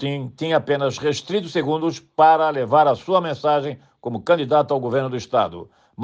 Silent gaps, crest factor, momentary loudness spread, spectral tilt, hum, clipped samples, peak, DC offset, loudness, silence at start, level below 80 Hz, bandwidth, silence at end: none; 16 dB; 11 LU; -6 dB/octave; none; under 0.1%; -4 dBFS; under 0.1%; -20 LUFS; 0 s; -64 dBFS; 8 kHz; 0 s